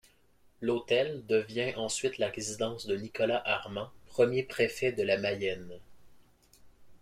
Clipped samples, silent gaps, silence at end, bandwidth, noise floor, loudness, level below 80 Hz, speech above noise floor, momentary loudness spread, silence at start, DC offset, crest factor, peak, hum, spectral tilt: under 0.1%; none; 0.05 s; 15.5 kHz; -63 dBFS; -31 LUFS; -64 dBFS; 32 dB; 8 LU; 0.6 s; under 0.1%; 20 dB; -12 dBFS; none; -4 dB/octave